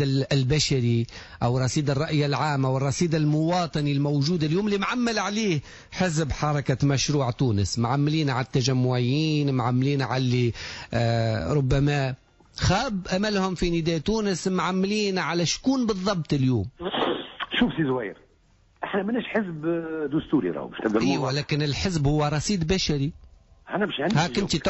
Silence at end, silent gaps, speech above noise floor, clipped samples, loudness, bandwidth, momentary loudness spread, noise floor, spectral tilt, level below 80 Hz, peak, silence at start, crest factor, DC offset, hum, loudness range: 0 s; none; 36 dB; under 0.1%; -25 LUFS; 8.2 kHz; 5 LU; -60 dBFS; -5.5 dB/octave; -44 dBFS; -10 dBFS; 0 s; 14 dB; under 0.1%; none; 3 LU